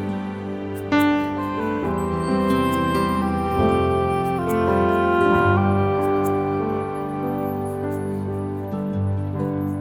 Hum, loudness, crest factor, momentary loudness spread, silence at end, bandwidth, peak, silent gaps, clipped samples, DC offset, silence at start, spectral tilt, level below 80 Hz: none; -22 LUFS; 16 dB; 9 LU; 0 s; 17.5 kHz; -6 dBFS; none; under 0.1%; under 0.1%; 0 s; -7.5 dB/octave; -42 dBFS